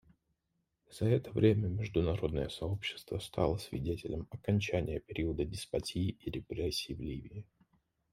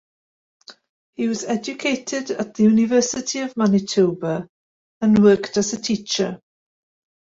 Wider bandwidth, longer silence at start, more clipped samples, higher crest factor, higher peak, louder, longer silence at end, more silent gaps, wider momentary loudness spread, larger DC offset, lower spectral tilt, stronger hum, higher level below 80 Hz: first, 15 kHz vs 7.8 kHz; first, 0.9 s vs 0.7 s; neither; about the same, 22 dB vs 18 dB; second, -14 dBFS vs -2 dBFS; second, -35 LUFS vs -20 LUFS; second, 0.7 s vs 0.85 s; second, none vs 0.89-1.13 s, 4.49-5.01 s; about the same, 11 LU vs 11 LU; neither; first, -6.5 dB/octave vs -5 dB/octave; neither; first, -52 dBFS vs -60 dBFS